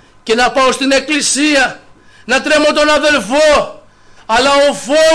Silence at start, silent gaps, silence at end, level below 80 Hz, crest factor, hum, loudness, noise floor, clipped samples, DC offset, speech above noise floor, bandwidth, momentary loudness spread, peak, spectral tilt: 0.25 s; none; 0 s; -40 dBFS; 8 dB; none; -11 LUFS; -41 dBFS; under 0.1%; 0.4%; 30 dB; 11 kHz; 6 LU; -4 dBFS; -1.5 dB/octave